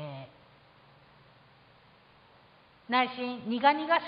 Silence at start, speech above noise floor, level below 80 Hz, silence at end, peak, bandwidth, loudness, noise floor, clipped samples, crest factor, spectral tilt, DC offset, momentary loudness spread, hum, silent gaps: 0 s; 32 dB; -76 dBFS; 0 s; -10 dBFS; 5.2 kHz; -28 LUFS; -60 dBFS; under 0.1%; 24 dB; -8 dB/octave; under 0.1%; 20 LU; none; none